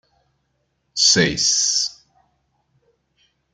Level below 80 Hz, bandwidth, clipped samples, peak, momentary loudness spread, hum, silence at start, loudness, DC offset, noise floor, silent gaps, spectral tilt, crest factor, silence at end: -54 dBFS; 11.5 kHz; under 0.1%; -2 dBFS; 11 LU; none; 0.95 s; -16 LUFS; under 0.1%; -70 dBFS; none; -1.5 dB/octave; 22 dB; 1.65 s